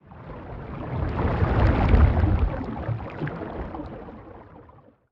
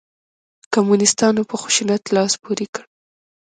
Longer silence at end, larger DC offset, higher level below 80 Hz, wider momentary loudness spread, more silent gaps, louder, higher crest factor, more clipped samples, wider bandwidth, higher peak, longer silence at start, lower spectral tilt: second, 0.5 s vs 0.75 s; neither; first, -28 dBFS vs -64 dBFS; first, 22 LU vs 10 LU; second, none vs 2.69-2.73 s; second, -25 LUFS vs -18 LUFS; about the same, 20 dB vs 20 dB; neither; second, 5.6 kHz vs 9.6 kHz; second, -6 dBFS vs 0 dBFS; second, 0.1 s vs 0.7 s; first, -10 dB/octave vs -3.5 dB/octave